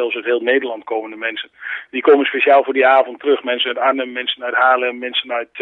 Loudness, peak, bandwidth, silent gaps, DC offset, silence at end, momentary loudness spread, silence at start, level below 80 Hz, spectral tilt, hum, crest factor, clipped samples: -16 LUFS; 0 dBFS; 4.1 kHz; none; under 0.1%; 0 s; 11 LU; 0 s; -72 dBFS; -5 dB/octave; none; 16 dB; under 0.1%